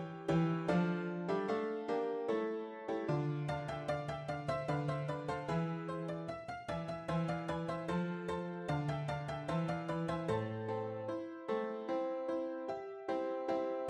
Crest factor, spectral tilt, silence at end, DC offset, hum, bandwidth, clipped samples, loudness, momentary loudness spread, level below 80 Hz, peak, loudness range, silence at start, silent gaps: 18 dB; -7.5 dB/octave; 0 s; under 0.1%; none; 10.5 kHz; under 0.1%; -39 LUFS; 6 LU; -64 dBFS; -20 dBFS; 2 LU; 0 s; none